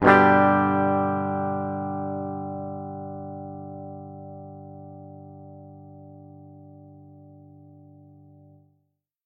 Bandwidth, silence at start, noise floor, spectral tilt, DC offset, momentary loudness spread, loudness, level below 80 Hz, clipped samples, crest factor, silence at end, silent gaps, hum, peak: 6.6 kHz; 0 s; -74 dBFS; -8.5 dB/octave; under 0.1%; 27 LU; -24 LUFS; -64 dBFS; under 0.1%; 26 dB; 2.3 s; none; 50 Hz at -90 dBFS; 0 dBFS